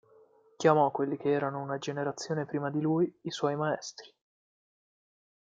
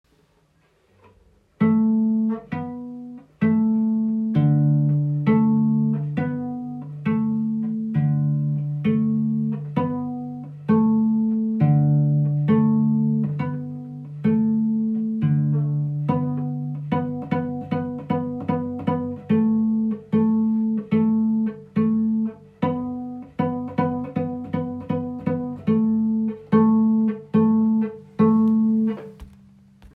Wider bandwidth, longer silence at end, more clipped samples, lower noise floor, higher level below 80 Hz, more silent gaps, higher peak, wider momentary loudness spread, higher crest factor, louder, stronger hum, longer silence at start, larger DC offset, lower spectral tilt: first, 7.8 kHz vs 3.7 kHz; first, 1.45 s vs 0.1 s; neither; about the same, -61 dBFS vs -62 dBFS; second, -78 dBFS vs -60 dBFS; neither; second, -10 dBFS vs -6 dBFS; about the same, 9 LU vs 10 LU; first, 22 dB vs 16 dB; second, -30 LUFS vs -22 LUFS; neither; second, 0.6 s vs 1.6 s; neither; second, -6 dB/octave vs -11.5 dB/octave